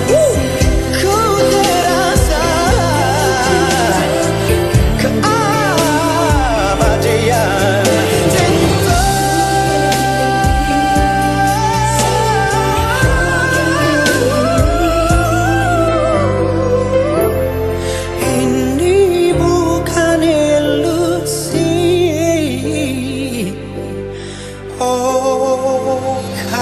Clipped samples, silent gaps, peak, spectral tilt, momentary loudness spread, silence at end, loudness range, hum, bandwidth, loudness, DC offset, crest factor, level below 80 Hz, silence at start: under 0.1%; none; 0 dBFS; -5 dB/octave; 6 LU; 0 s; 4 LU; none; 13 kHz; -13 LUFS; under 0.1%; 12 dB; -24 dBFS; 0 s